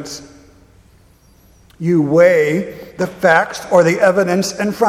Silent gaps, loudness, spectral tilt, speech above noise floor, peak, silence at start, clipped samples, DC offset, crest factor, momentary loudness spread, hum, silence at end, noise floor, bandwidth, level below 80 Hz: none; -14 LUFS; -5.5 dB/octave; 35 dB; 0 dBFS; 0 s; under 0.1%; under 0.1%; 16 dB; 13 LU; none; 0 s; -49 dBFS; 15 kHz; -52 dBFS